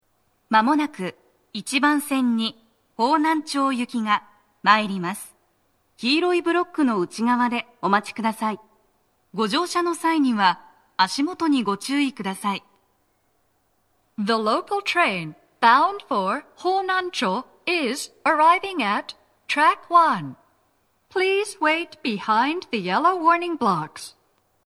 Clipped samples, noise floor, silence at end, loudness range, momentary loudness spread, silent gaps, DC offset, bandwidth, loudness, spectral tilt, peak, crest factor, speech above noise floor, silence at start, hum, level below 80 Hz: under 0.1%; -68 dBFS; 0.6 s; 4 LU; 11 LU; none; under 0.1%; 14 kHz; -22 LUFS; -4 dB/octave; 0 dBFS; 22 dB; 46 dB; 0.5 s; none; -72 dBFS